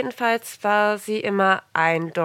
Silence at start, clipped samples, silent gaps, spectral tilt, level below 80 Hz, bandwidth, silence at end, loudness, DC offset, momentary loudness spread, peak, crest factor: 0 s; under 0.1%; none; -4.5 dB/octave; -74 dBFS; 17 kHz; 0 s; -21 LUFS; under 0.1%; 5 LU; -4 dBFS; 18 dB